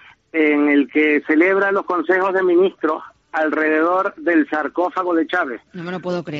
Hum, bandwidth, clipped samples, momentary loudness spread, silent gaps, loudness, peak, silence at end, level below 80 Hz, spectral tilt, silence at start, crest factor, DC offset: none; 7 kHz; under 0.1%; 10 LU; none; -18 LUFS; -4 dBFS; 0 s; -70 dBFS; -4 dB/octave; 0.35 s; 14 dB; under 0.1%